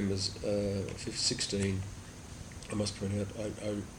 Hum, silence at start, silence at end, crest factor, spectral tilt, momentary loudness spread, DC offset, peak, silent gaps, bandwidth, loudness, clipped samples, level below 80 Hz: none; 0 s; 0 s; 18 dB; -4.5 dB/octave; 15 LU; under 0.1%; -18 dBFS; none; 16.5 kHz; -34 LUFS; under 0.1%; -54 dBFS